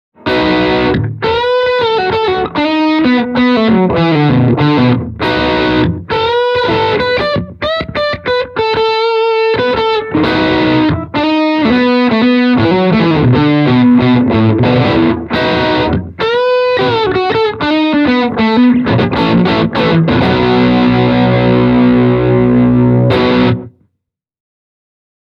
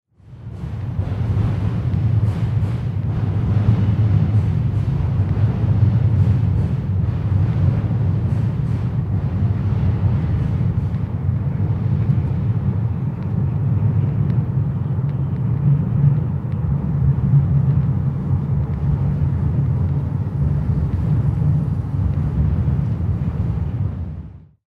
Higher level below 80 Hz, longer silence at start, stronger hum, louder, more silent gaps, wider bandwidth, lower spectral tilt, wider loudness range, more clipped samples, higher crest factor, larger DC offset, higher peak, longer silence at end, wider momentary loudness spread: about the same, -34 dBFS vs -30 dBFS; about the same, 0.25 s vs 0.25 s; neither; first, -11 LUFS vs -20 LUFS; neither; first, 6.6 kHz vs 4.7 kHz; second, -8 dB/octave vs -10.5 dB/octave; about the same, 3 LU vs 2 LU; neither; second, 10 dB vs 16 dB; neither; first, 0 dBFS vs -4 dBFS; first, 1.6 s vs 0.3 s; about the same, 5 LU vs 6 LU